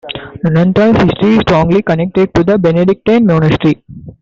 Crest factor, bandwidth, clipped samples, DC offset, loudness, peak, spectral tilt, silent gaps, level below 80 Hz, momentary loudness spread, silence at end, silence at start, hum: 10 dB; 7.4 kHz; under 0.1%; under 0.1%; -11 LUFS; 0 dBFS; -8.5 dB/octave; none; -36 dBFS; 5 LU; 0.1 s; 0.05 s; none